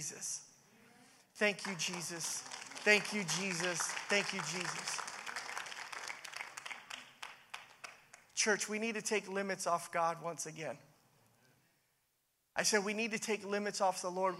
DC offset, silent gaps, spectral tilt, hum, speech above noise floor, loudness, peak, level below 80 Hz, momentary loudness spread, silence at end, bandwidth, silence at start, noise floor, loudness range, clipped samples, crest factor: under 0.1%; none; -2 dB/octave; none; 43 dB; -37 LUFS; -14 dBFS; -88 dBFS; 14 LU; 0 s; 16 kHz; 0 s; -80 dBFS; 7 LU; under 0.1%; 26 dB